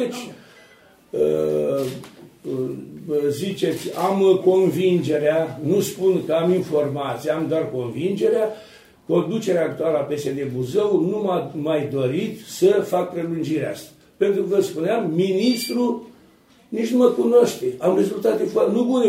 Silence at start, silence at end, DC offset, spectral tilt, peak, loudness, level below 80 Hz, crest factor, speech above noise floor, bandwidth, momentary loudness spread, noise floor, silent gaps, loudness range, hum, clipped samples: 0 s; 0 s; under 0.1%; -6 dB/octave; -4 dBFS; -21 LUFS; -64 dBFS; 18 dB; 33 dB; 16 kHz; 10 LU; -53 dBFS; none; 3 LU; none; under 0.1%